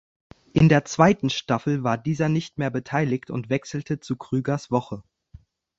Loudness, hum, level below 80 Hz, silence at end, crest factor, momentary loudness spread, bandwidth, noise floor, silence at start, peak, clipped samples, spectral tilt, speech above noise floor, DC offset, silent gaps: -23 LUFS; none; -52 dBFS; 0.75 s; 22 dB; 12 LU; 7.8 kHz; -51 dBFS; 0.55 s; -2 dBFS; under 0.1%; -6.5 dB/octave; 28 dB; under 0.1%; none